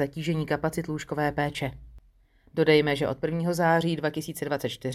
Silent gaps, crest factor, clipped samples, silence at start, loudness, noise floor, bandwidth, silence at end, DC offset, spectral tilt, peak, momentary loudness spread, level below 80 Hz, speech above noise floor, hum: none; 20 dB; under 0.1%; 0 s; -27 LUFS; -60 dBFS; 15.5 kHz; 0 s; under 0.1%; -6 dB/octave; -8 dBFS; 11 LU; -54 dBFS; 33 dB; none